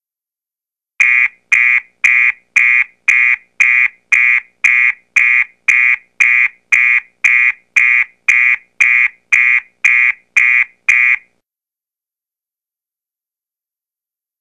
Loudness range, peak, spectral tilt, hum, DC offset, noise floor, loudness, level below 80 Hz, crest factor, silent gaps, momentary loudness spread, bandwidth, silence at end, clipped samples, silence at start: 4 LU; 0 dBFS; 2.5 dB/octave; none; under 0.1%; -90 dBFS; -10 LUFS; -64 dBFS; 14 dB; none; 3 LU; 11 kHz; 3.2 s; under 0.1%; 1 s